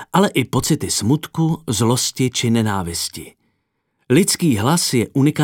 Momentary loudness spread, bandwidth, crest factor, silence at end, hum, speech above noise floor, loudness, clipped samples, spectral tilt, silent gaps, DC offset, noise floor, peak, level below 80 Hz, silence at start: 5 LU; 17.5 kHz; 18 dB; 0 s; none; 53 dB; -18 LUFS; under 0.1%; -4.5 dB/octave; none; under 0.1%; -70 dBFS; 0 dBFS; -48 dBFS; 0 s